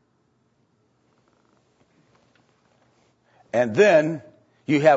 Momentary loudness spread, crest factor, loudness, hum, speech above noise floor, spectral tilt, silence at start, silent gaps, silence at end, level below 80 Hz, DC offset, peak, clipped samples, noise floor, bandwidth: 18 LU; 20 dB; -20 LUFS; none; 49 dB; -6 dB/octave; 3.55 s; none; 0 s; -76 dBFS; under 0.1%; -4 dBFS; under 0.1%; -67 dBFS; 8 kHz